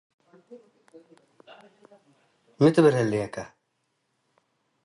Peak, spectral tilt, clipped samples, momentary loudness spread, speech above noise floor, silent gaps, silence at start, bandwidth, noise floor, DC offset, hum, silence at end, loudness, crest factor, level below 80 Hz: -6 dBFS; -7 dB/octave; under 0.1%; 20 LU; 53 dB; none; 0.5 s; 11.5 kHz; -76 dBFS; under 0.1%; none; 1.4 s; -22 LUFS; 22 dB; -66 dBFS